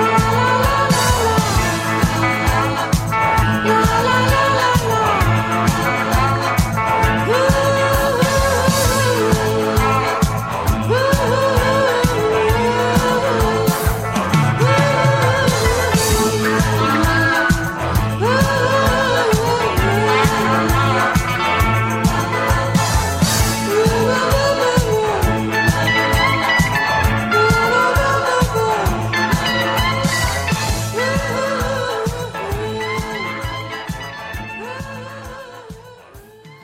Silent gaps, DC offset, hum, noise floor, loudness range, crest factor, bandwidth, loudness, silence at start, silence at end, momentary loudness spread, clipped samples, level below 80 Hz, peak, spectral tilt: none; 0.2%; none; -41 dBFS; 5 LU; 14 dB; 16.5 kHz; -16 LUFS; 0 s; 0.05 s; 7 LU; under 0.1%; -28 dBFS; -2 dBFS; -4.5 dB/octave